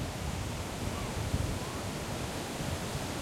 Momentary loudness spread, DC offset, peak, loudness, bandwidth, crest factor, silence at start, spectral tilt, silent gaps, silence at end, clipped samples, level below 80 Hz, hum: 3 LU; under 0.1%; -18 dBFS; -36 LUFS; 16.5 kHz; 18 dB; 0 s; -4.5 dB/octave; none; 0 s; under 0.1%; -44 dBFS; none